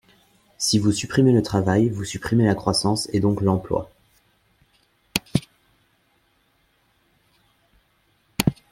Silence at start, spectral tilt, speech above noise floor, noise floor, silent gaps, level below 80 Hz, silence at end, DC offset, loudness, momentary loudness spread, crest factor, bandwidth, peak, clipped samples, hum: 0.6 s; -5.5 dB/octave; 44 dB; -65 dBFS; none; -50 dBFS; 0.2 s; under 0.1%; -22 LUFS; 10 LU; 24 dB; 16.5 kHz; 0 dBFS; under 0.1%; none